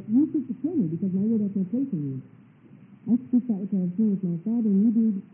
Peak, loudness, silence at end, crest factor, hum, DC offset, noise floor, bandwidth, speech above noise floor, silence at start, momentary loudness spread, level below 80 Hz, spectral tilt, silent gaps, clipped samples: -12 dBFS; -25 LUFS; 0.1 s; 12 dB; none; under 0.1%; -51 dBFS; 2.6 kHz; 26 dB; 0 s; 7 LU; -76 dBFS; -15 dB/octave; none; under 0.1%